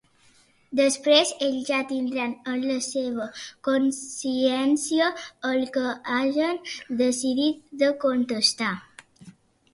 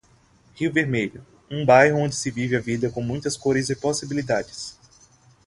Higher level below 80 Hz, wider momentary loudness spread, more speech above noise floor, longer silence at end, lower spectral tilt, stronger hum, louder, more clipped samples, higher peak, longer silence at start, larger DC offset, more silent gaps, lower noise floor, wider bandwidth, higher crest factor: second, -70 dBFS vs -54 dBFS; second, 9 LU vs 14 LU; about the same, 35 dB vs 35 dB; second, 0.45 s vs 0.75 s; second, -2.5 dB/octave vs -5 dB/octave; neither; about the same, -24 LUFS vs -22 LUFS; neither; second, -8 dBFS vs -2 dBFS; first, 0.7 s vs 0.55 s; neither; neither; about the same, -59 dBFS vs -57 dBFS; about the same, 11.5 kHz vs 11.5 kHz; about the same, 18 dB vs 22 dB